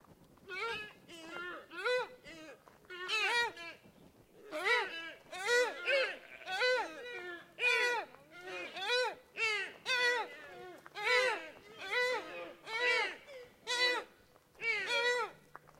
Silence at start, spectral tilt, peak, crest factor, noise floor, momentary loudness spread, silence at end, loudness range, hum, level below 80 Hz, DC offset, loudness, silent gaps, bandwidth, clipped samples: 0.1 s; -0.5 dB/octave; -18 dBFS; 20 dB; -64 dBFS; 19 LU; 0.4 s; 4 LU; none; -78 dBFS; under 0.1%; -34 LUFS; none; 16 kHz; under 0.1%